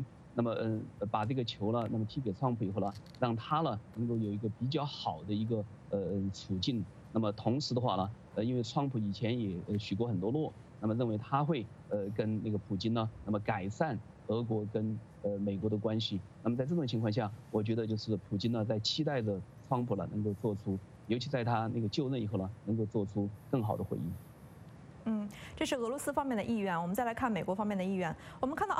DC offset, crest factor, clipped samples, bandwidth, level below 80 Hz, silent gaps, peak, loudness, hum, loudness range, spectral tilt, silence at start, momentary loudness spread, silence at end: under 0.1%; 18 dB; under 0.1%; 13.5 kHz; -64 dBFS; none; -16 dBFS; -35 LUFS; none; 2 LU; -7 dB/octave; 0 s; 5 LU; 0 s